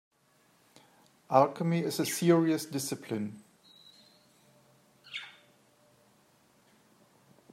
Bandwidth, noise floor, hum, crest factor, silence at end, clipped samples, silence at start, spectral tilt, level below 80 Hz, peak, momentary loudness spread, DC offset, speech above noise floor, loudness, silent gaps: 16 kHz; -67 dBFS; none; 26 dB; 2.25 s; under 0.1%; 1.3 s; -5.5 dB/octave; -82 dBFS; -8 dBFS; 17 LU; under 0.1%; 39 dB; -30 LUFS; none